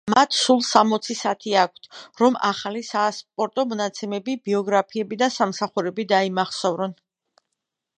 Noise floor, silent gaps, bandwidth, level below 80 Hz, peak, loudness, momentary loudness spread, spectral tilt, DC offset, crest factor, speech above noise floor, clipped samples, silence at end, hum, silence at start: -81 dBFS; none; 11 kHz; -72 dBFS; 0 dBFS; -22 LUFS; 10 LU; -3.5 dB/octave; under 0.1%; 22 dB; 59 dB; under 0.1%; 1.05 s; none; 0.05 s